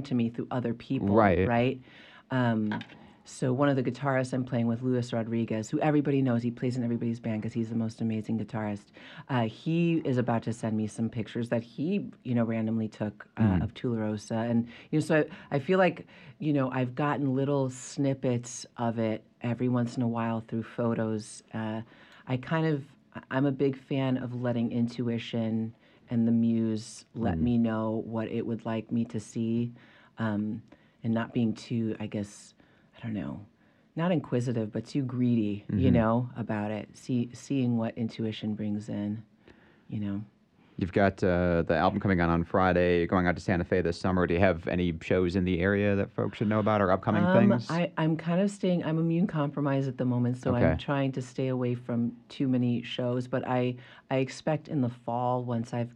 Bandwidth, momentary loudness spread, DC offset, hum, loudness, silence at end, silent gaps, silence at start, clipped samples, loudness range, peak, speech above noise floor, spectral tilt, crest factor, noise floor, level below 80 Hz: 10 kHz; 10 LU; under 0.1%; none; -29 LUFS; 0 s; none; 0 s; under 0.1%; 6 LU; -10 dBFS; 29 dB; -7.5 dB/octave; 20 dB; -58 dBFS; -56 dBFS